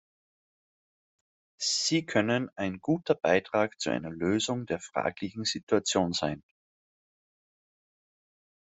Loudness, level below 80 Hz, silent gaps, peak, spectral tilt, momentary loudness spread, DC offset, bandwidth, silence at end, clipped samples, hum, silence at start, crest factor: -29 LUFS; -68 dBFS; 5.63-5.67 s; -10 dBFS; -4 dB/octave; 7 LU; under 0.1%; 8.2 kHz; 2.25 s; under 0.1%; none; 1.6 s; 22 dB